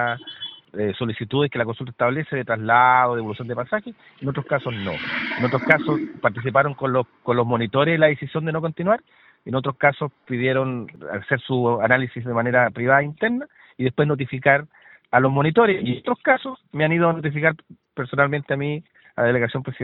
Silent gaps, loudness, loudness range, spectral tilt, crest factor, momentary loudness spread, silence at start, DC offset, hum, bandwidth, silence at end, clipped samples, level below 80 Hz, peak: none; -21 LUFS; 2 LU; -9.5 dB/octave; 22 dB; 11 LU; 0 s; under 0.1%; none; 5.6 kHz; 0 s; under 0.1%; -60 dBFS; 0 dBFS